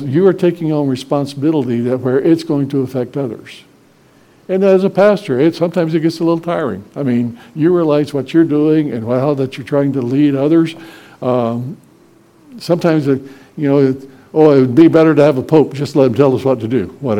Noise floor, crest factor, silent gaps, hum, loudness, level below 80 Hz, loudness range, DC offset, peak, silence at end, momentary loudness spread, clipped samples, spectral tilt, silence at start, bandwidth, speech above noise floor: -48 dBFS; 14 dB; none; none; -14 LUFS; -58 dBFS; 6 LU; under 0.1%; 0 dBFS; 0 s; 10 LU; 0.2%; -8 dB/octave; 0 s; 12 kHz; 35 dB